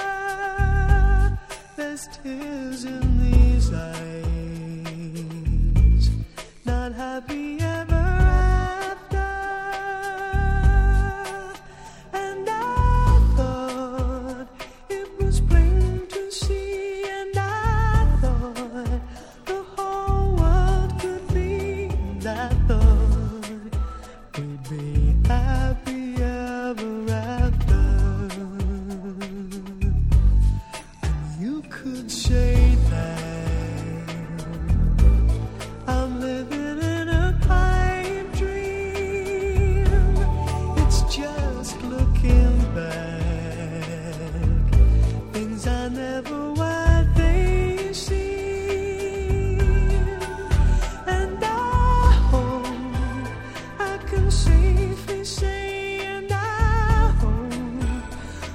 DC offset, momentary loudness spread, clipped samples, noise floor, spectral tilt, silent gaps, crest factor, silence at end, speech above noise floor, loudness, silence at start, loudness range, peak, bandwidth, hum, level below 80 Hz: under 0.1%; 13 LU; under 0.1%; -42 dBFS; -6.5 dB/octave; none; 18 dB; 0 s; 21 dB; -23 LUFS; 0 s; 3 LU; -2 dBFS; 12 kHz; none; -22 dBFS